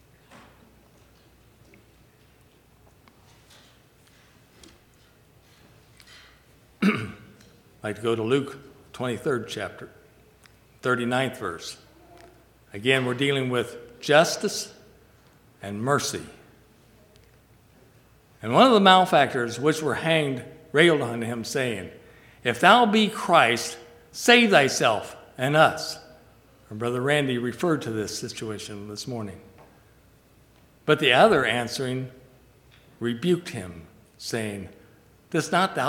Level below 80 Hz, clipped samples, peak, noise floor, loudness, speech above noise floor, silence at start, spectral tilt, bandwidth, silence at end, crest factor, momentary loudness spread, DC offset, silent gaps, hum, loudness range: -62 dBFS; under 0.1%; 0 dBFS; -57 dBFS; -23 LUFS; 34 dB; 6.8 s; -4 dB/octave; 18.5 kHz; 0 s; 26 dB; 21 LU; under 0.1%; none; none; 12 LU